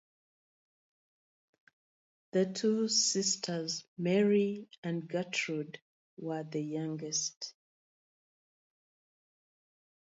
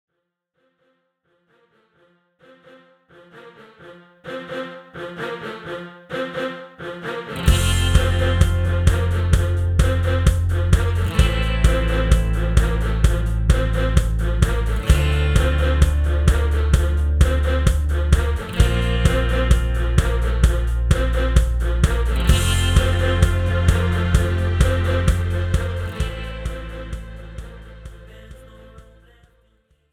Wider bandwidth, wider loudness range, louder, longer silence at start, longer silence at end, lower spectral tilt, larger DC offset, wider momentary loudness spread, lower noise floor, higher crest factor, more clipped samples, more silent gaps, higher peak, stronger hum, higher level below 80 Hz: second, 8 kHz vs 15 kHz; second, 9 LU vs 14 LU; second, -33 LUFS vs -20 LUFS; second, 2.35 s vs 3.35 s; first, 2.6 s vs 1.1 s; second, -3.5 dB/octave vs -5.5 dB/octave; neither; about the same, 13 LU vs 14 LU; first, under -90 dBFS vs -77 dBFS; about the same, 20 dB vs 16 dB; neither; first, 3.88-3.96 s, 4.78-4.83 s, 5.82-6.17 s, 7.37-7.41 s vs none; second, -16 dBFS vs -2 dBFS; neither; second, -84 dBFS vs -22 dBFS